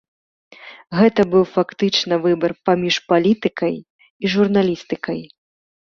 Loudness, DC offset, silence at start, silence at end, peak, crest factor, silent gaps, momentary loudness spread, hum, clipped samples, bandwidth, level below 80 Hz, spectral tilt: -18 LUFS; under 0.1%; 0.65 s; 0.6 s; -2 dBFS; 18 dB; 3.90-3.99 s, 4.10-4.20 s; 9 LU; none; under 0.1%; 7.2 kHz; -58 dBFS; -5.5 dB/octave